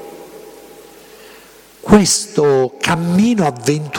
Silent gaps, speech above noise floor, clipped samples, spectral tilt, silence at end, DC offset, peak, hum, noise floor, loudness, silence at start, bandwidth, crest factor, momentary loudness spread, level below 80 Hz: none; 29 dB; under 0.1%; -4.5 dB/octave; 0 s; under 0.1%; 0 dBFS; none; -42 dBFS; -14 LUFS; 0 s; 17.5 kHz; 16 dB; 23 LU; -42 dBFS